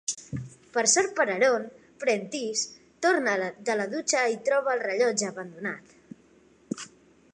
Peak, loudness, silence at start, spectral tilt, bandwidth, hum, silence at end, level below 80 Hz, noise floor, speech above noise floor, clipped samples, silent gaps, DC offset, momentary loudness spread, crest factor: -10 dBFS; -26 LUFS; 0.1 s; -2.5 dB/octave; 11 kHz; none; 0.45 s; -68 dBFS; -59 dBFS; 33 dB; under 0.1%; none; under 0.1%; 15 LU; 18 dB